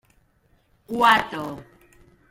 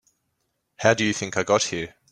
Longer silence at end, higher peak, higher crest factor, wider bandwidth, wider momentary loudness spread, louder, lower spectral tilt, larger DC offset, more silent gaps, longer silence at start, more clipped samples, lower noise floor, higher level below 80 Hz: first, 0.7 s vs 0.25 s; about the same, -4 dBFS vs -2 dBFS; about the same, 22 dB vs 22 dB; first, 16.5 kHz vs 11 kHz; first, 18 LU vs 6 LU; first, -20 LUFS vs -23 LUFS; about the same, -3.5 dB/octave vs -3.5 dB/octave; neither; neither; about the same, 0.9 s vs 0.8 s; neither; second, -63 dBFS vs -75 dBFS; about the same, -58 dBFS vs -60 dBFS